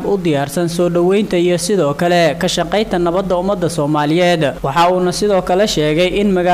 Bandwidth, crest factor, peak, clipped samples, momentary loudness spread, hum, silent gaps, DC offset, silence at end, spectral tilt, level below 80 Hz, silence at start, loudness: 16 kHz; 8 dB; -6 dBFS; under 0.1%; 4 LU; none; none; under 0.1%; 0 s; -5 dB/octave; -38 dBFS; 0 s; -14 LUFS